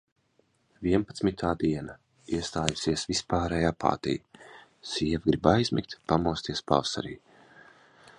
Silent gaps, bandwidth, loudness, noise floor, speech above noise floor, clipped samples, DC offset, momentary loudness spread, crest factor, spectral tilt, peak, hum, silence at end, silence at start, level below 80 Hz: none; 11 kHz; -28 LUFS; -69 dBFS; 41 dB; under 0.1%; under 0.1%; 10 LU; 26 dB; -5 dB/octave; -4 dBFS; none; 1 s; 0.8 s; -48 dBFS